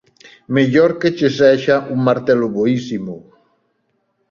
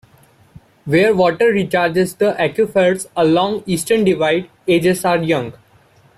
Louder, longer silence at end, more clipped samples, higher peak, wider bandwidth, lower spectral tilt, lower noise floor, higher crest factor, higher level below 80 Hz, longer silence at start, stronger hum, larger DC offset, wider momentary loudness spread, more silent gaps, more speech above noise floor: about the same, -15 LUFS vs -16 LUFS; first, 1.1 s vs 0.65 s; neither; about the same, -2 dBFS vs -2 dBFS; second, 7.4 kHz vs 15 kHz; first, -7 dB/octave vs -5.5 dB/octave; first, -67 dBFS vs -51 dBFS; about the same, 16 dB vs 14 dB; about the same, -58 dBFS vs -54 dBFS; second, 0.25 s vs 0.85 s; neither; neither; first, 13 LU vs 6 LU; neither; first, 52 dB vs 36 dB